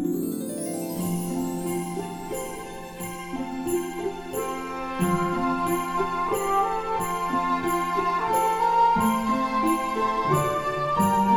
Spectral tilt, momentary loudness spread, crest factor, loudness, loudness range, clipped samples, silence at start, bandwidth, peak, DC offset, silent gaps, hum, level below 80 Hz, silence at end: -5.5 dB/octave; 10 LU; 16 dB; -26 LUFS; 8 LU; under 0.1%; 0 s; over 20 kHz; -8 dBFS; under 0.1%; none; none; -48 dBFS; 0 s